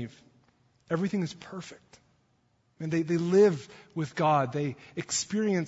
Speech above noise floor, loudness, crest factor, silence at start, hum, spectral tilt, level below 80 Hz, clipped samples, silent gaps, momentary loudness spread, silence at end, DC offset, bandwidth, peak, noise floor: 42 dB; -28 LUFS; 18 dB; 0 s; none; -5.5 dB/octave; -70 dBFS; under 0.1%; none; 19 LU; 0 s; under 0.1%; 8 kHz; -12 dBFS; -70 dBFS